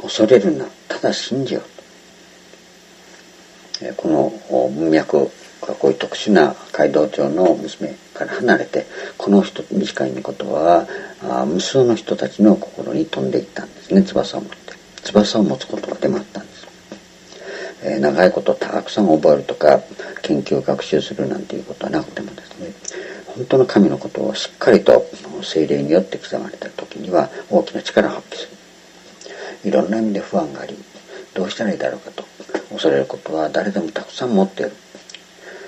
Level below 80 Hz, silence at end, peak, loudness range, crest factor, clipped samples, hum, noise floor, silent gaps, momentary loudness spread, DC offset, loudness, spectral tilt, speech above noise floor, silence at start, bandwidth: -58 dBFS; 0 s; 0 dBFS; 6 LU; 18 dB; under 0.1%; none; -45 dBFS; none; 18 LU; under 0.1%; -18 LUFS; -5.5 dB/octave; 27 dB; 0 s; 8.4 kHz